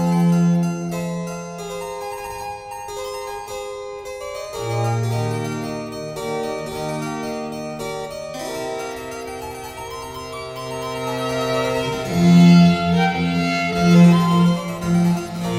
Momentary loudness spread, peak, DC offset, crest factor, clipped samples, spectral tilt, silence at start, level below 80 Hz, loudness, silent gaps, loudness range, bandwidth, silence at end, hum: 18 LU; -2 dBFS; under 0.1%; 18 dB; under 0.1%; -6.5 dB/octave; 0 s; -48 dBFS; -20 LUFS; none; 14 LU; 15 kHz; 0 s; none